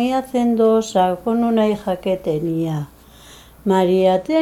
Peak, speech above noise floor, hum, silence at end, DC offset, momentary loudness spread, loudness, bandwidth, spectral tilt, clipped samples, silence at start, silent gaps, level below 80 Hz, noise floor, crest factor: -4 dBFS; 26 dB; none; 0 s; under 0.1%; 8 LU; -18 LUFS; 15.5 kHz; -6.5 dB/octave; under 0.1%; 0 s; none; -50 dBFS; -44 dBFS; 14 dB